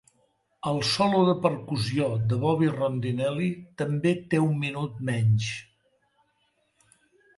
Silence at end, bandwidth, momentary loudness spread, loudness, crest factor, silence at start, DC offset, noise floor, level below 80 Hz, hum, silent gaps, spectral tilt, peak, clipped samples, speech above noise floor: 1.75 s; 11.5 kHz; 9 LU; -26 LUFS; 20 dB; 0.65 s; under 0.1%; -71 dBFS; -60 dBFS; none; none; -6.5 dB/octave; -8 dBFS; under 0.1%; 46 dB